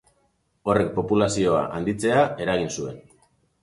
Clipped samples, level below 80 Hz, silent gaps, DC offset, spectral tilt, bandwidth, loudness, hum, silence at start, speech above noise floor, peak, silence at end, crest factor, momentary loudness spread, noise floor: under 0.1%; -50 dBFS; none; under 0.1%; -5.5 dB/octave; 11.5 kHz; -23 LUFS; none; 0.65 s; 45 dB; -6 dBFS; 0.6 s; 18 dB; 10 LU; -68 dBFS